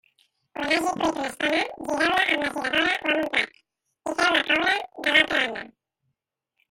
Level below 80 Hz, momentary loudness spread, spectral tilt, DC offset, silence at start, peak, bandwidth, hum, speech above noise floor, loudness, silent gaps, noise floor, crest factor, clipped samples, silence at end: -60 dBFS; 11 LU; -2 dB/octave; under 0.1%; 0.55 s; -4 dBFS; 16.5 kHz; none; 57 dB; -23 LUFS; none; -81 dBFS; 20 dB; under 0.1%; 1 s